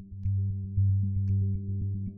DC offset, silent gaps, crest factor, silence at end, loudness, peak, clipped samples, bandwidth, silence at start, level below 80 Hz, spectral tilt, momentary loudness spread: under 0.1%; none; 10 dB; 0 s; -30 LUFS; -18 dBFS; under 0.1%; 0.4 kHz; 0 s; -46 dBFS; -16 dB/octave; 6 LU